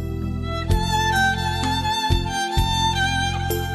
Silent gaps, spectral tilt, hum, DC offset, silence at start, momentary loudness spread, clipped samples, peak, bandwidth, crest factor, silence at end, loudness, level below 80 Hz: none; -4 dB/octave; none; under 0.1%; 0 s; 7 LU; under 0.1%; -6 dBFS; 13 kHz; 14 dB; 0 s; -21 LUFS; -30 dBFS